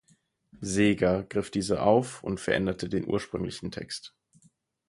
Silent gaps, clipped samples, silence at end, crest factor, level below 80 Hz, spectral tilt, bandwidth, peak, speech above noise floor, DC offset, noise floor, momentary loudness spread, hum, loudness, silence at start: none; under 0.1%; 0.8 s; 22 dB; -52 dBFS; -5.5 dB/octave; 11.5 kHz; -8 dBFS; 39 dB; under 0.1%; -67 dBFS; 14 LU; none; -28 LUFS; 0.55 s